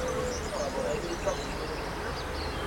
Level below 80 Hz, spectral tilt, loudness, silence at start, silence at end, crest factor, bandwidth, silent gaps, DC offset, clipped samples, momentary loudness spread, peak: -42 dBFS; -4 dB/octave; -33 LUFS; 0 s; 0 s; 16 dB; 16.5 kHz; none; under 0.1%; under 0.1%; 3 LU; -18 dBFS